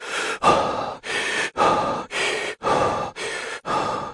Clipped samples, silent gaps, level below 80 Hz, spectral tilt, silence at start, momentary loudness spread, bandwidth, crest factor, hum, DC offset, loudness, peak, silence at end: under 0.1%; none; -52 dBFS; -3 dB/octave; 0 s; 9 LU; 11.5 kHz; 20 dB; none; under 0.1%; -23 LUFS; -4 dBFS; 0 s